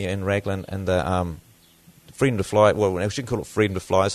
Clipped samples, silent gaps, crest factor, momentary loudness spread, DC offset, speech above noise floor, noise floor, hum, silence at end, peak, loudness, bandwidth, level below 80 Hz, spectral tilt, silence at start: under 0.1%; none; 20 dB; 10 LU; under 0.1%; 31 dB; -53 dBFS; none; 0 s; -4 dBFS; -23 LUFS; 13.5 kHz; -48 dBFS; -6 dB/octave; 0 s